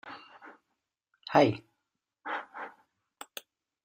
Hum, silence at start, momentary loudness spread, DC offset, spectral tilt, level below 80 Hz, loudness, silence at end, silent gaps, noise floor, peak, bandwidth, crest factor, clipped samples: none; 0.05 s; 25 LU; under 0.1%; -6 dB/octave; -74 dBFS; -29 LUFS; 1.15 s; none; -85 dBFS; -8 dBFS; 15 kHz; 26 dB; under 0.1%